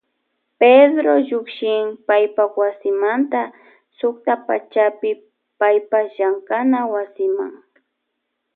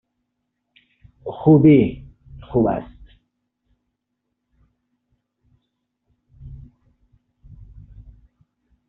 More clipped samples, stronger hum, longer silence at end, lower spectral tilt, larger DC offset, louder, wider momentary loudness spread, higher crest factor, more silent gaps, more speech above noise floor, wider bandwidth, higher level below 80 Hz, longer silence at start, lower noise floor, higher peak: neither; first, 60 Hz at -55 dBFS vs none; second, 1 s vs 2.35 s; about the same, -8.5 dB/octave vs -9.5 dB/octave; neither; about the same, -18 LUFS vs -17 LUFS; second, 11 LU vs 30 LU; about the same, 18 dB vs 20 dB; neither; second, 58 dB vs 63 dB; first, 4.3 kHz vs 3.8 kHz; second, -78 dBFS vs -48 dBFS; second, 0.6 s vs 1.25 s; about the same, -75 dBFS vs -77 dBFS; about the same, 0 dBFS vs -2 dBFS